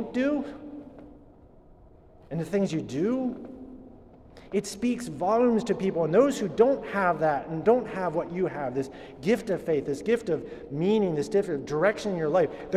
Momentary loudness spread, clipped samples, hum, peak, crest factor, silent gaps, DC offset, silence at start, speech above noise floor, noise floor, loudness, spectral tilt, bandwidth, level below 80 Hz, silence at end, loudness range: 13 LU; under 0.1%; none; -8 dBFS; 20 dB; none; under 0.1%; 0 s; 27 dB; -53 dBFS; -27 LUFS; -6.5 dB/octave; 13.5 kHz; -56 dBFS; 0 s; 8 LU